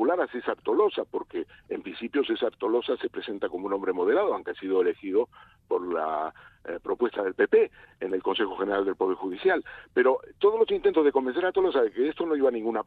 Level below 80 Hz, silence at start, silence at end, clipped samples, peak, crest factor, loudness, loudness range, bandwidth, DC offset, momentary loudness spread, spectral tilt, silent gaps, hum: -64 dBFS; 0 s; 0.05 s; under 0.1%; -10 dBFS; 16 dB; -27 LUFS; 4 LU; 4.6 kHz; under 0.1%; 10 LU; -7 dB/octave; none; none